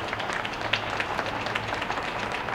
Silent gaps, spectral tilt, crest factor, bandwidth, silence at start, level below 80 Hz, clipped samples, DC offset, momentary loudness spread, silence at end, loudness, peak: none; -3.5 dB/octave; 24 dB; 17 kHz; 0 s; -50 dBFS; under 0.1%; under 0.1%; 2 LU; 0 s; -29 LUFS; -6 dBFS